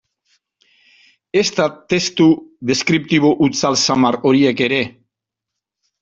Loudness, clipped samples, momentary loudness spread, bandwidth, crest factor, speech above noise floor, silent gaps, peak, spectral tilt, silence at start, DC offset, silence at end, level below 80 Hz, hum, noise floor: -16 LUFS; under 0.1%; 6 LU; 7.8 kHz; 16 dB; 67 dB; none; -2 dBFS; -4.5 dB/octave; 1.35 s; under 0.1%; 1.1 s; -56 dBFS; none; -82 dBFS